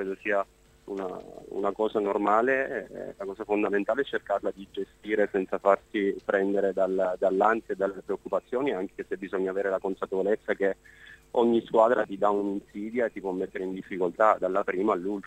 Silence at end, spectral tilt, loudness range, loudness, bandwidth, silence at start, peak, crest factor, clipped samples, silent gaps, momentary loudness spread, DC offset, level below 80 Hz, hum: 0 s; -6.5 dB/octave; 3 LU; -28 LUFS; 9.2 kHz; 0 s; -6 dBFS; 22 dB; under 0.1%; none; 12 LU; under 0.1%; -62 dBFS; none